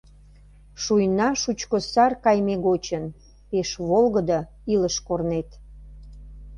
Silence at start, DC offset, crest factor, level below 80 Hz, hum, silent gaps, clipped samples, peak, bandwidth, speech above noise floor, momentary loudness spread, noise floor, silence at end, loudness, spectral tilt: 0.75 s; under 0.1%; 18 dB; -46 dBFS; 50 Hz at -45 dBFS; none; under 0.1%; -6 dBFS; 10.5 kHz; 27 dB; 10 LU; -49 dBFS; 0 s; -23 LUFS; -5 dB/octave